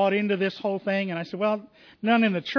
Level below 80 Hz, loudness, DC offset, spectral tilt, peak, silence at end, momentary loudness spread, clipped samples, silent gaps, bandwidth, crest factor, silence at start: -76 dBFS; -26 LUFS; under 0.1%; -7.5 dB/octave; -10 dBFS; 0 s; 9 LU; under 0.1%; none; 5.4 kHz; 14 dB; 0 s